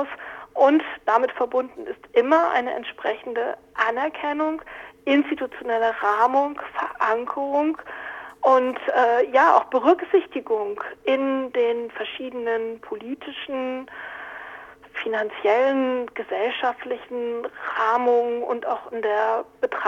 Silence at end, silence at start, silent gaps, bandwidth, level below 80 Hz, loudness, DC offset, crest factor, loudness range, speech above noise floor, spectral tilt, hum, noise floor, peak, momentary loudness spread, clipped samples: 0 s; 0 s; none; 7.4 kHz; -66 dBFS; -23 LUFS; under 0.1%; 20 dB; 6 LU; 20 dB; -4.5 dB/octave; none; -42 dBFS; -2 dBFS; 14 LU; under 0.1%